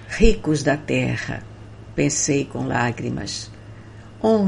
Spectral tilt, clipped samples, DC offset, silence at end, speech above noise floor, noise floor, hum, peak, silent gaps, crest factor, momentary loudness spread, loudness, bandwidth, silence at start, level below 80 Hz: -4.5 dB/octave; under 0.1%; under 0.1%; 0 s; 20 dB; -40 dBFS; none; 0 dBFS; none; 22 dB; 22 LU; -22 LUFS; 11 kHz; 0 s; -32 dBFS